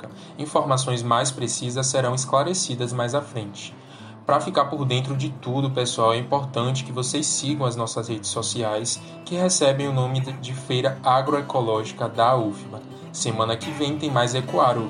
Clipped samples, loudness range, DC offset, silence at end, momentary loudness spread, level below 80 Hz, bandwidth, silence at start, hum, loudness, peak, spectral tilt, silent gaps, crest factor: under 0.1%; 2 LU; under 0.1%; 0 s; 11 LU; -64 dBFS; 11 kHz; 0 s; none; -23 LUFS; -6 dBFS; -4.5 dB/octave; none; 18 dB